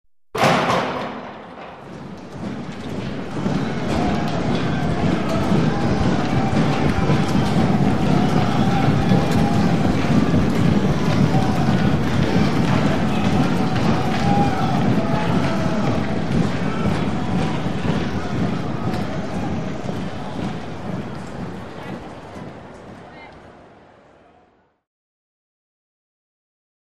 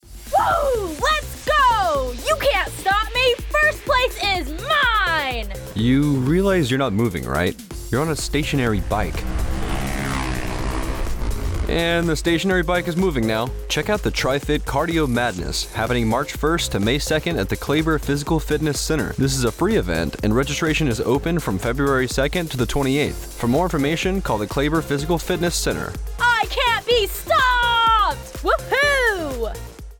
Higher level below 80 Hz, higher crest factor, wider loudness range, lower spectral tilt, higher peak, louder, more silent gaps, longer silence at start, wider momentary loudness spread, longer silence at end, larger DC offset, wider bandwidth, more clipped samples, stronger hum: second, -38 dBFS vs -30 dBFS; about the same, 18 dB vs 14 dB; first, 13 LU vs 4 LU; first, -7 dB/octave vs -4.5 dB/octave; first, -2 dBFS vs -6 dBFS; about the same, -20 LUFS vs -20 LUFS; neither; about the same, 0.05 s vs 0.05 s; first, 15 LU vs 8 LU; first, 1.95 s vs 0.05 s; first, 5% vs under 0.1%; second, 14.5 kHz vs 19.5 kHz; neither; neither